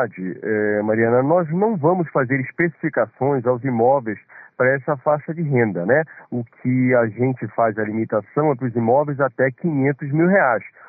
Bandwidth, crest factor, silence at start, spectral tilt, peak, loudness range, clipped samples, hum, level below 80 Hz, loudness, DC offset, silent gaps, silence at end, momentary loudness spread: 2.6 kHz; 14 dB; 0 s; -11 dB/octave; -6 dBFS; 1 LU; under 0.1%; none; -66 dBFS; -20 LUFS; under 0.1%; none; 0.2 s; 6 LU